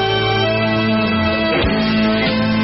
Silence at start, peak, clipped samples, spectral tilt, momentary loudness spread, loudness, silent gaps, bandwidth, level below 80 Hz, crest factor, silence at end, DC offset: 0 s; -6 dBFS; under 0.1%; -4 dB/octave; 1 LU; -16 LUFS; none; 6 kHz; -34 dBFS; 10 dB; 0 s; under 0.1%